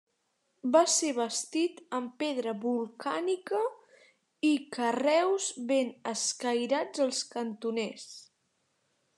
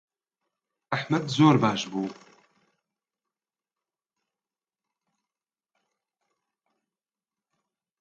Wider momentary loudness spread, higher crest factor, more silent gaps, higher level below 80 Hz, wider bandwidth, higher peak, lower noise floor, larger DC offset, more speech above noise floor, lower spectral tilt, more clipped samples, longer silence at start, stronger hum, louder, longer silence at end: second, 10 LU vs 13 LU; about the same, 22 dB vs 26 dB; neither; second, under -90 dBFS vs -72 dBFS; first, 12.5 kHz vs 7.8 kHz; second, -10 dBFS vs -6 dBFS; second, -77 dBFS vs under -90 dBFS; neither; second, 47 dB vs over 66 dB; second, -2 dB/octave vs -6 dB/octave; neither; second, 0.65 s vs 0.9 s; neither; second, -30 LUFS vs -24 LUFS; second, 0.95 s vs 5.85 s